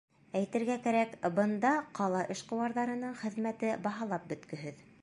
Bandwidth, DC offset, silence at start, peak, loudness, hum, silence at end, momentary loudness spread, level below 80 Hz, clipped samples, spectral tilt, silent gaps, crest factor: 11.5 kHz; under 0.1%; 0.35 s; -16 dBFS; -34 LUFS; none; 0.2 s; 9 LU; -76 dBFS; under 0.1%; -6 dB/octave; none; 18 dB